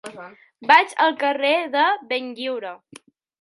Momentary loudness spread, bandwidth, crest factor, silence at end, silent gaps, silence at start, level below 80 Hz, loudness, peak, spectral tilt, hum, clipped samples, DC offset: 19 LU; 11.5 kHz; 22 dB; 0.65 s; none; 0.05 s; -78 dBFS; -19 LUFS; 0 dBFS; -2.5 dB/octave; none; under 0.1%; under 0.1%